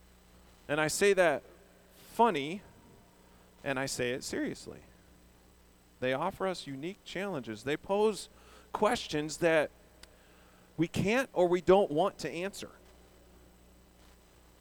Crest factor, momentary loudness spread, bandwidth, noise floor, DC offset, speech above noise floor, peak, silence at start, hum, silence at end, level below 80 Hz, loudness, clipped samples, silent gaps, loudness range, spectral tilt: 22 dB; 17 LU; over 20 kHz; -61 dBFS; under 0.1%; 30 dB; -12 dBFS; 0.7 s; 60 Hz at -65 dBFS; 1.95 s; -62 dBFS; -31 LUFS; under 0.1%; none; 8 LU; -4.5 dB/octave